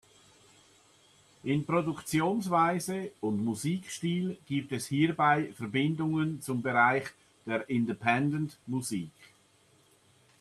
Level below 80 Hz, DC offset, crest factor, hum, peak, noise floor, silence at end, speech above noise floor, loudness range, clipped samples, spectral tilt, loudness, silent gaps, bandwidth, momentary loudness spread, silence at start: -68 dBFS; under 0.1%; 22 dB; none; -10 dBFS; -65 dBFS; 1.15 s; 35 dB; 3 LU; under 0.1%; -5.5 dB/octave; -30 LUFS; none; 14 kHz; 9 LU; 1.45 s